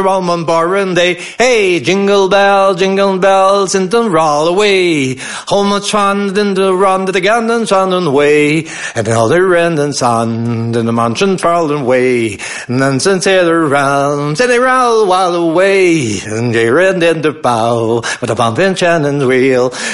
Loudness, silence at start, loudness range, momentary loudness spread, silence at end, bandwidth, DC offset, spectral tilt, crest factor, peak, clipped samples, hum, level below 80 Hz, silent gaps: -11 LUFS; 0 s; 2 LU; 5 LU; 0 s; 11.5 kHz; 0.5%; -4.5 dB/octave; 10 dB; 0 dBFS; under 0.1%; none; -48 dBFS; none